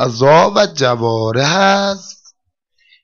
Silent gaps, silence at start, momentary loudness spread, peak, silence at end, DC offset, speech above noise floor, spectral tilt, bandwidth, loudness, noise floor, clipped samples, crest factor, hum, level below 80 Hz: none; 0 s; 7 LU; -2 dBFS; 0.9 s; under 0.1%; 53 dB; -4.5 dB/octave; 7.2 kHz; -13 LUFS; -66 dBFS; under 0.1%; 12 dB; none; -54 dBFS